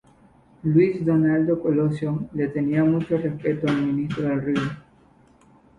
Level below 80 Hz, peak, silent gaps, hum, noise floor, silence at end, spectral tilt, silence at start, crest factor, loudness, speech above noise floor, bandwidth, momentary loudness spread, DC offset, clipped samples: -56 dBFS; -6 dBFS; none; none; -55 dBFS; 1 s; -9 dB/octave; 0.65 s; 16 dB; -23 LUFS; 34 dB; 8.8 kHz; 7 LU; under 0.1%; under 0.1%